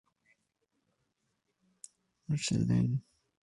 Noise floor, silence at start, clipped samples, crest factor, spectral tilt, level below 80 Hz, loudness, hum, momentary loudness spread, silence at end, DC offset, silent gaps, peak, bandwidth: -81 dBFS; 2.3 s; under 0.1%; 18 dB; -5.5 dB/octave; -60 dBFS; -32 LUFS; none; 24 LU; 0.45 s; under 0.1%; none; -18 dBFS; 11.5 kHz